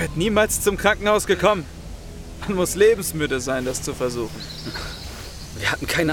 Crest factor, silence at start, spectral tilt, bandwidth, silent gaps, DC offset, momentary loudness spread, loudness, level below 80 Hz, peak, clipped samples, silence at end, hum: 20 dB; 0 s; -4 dB/octave; 18.5 kHz; none; under 0.1%; 18 LU; -21 LUFS; -38 dBFS; -2 dBFS; under 0.1%; 0 s; none